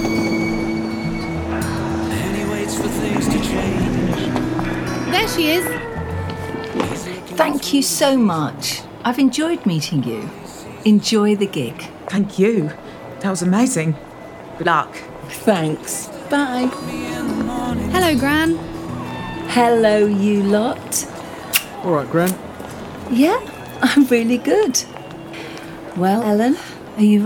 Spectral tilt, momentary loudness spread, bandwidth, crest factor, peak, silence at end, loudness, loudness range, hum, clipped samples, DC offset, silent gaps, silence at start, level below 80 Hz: -5 dB/octave; 15 LU; 19.5 kHz; 18 dB; 0 dBFS; 0 s; -19 LUFS; 3 LU; none; under 0.1%; under 0.1%; none; 0 s; -40 dBFS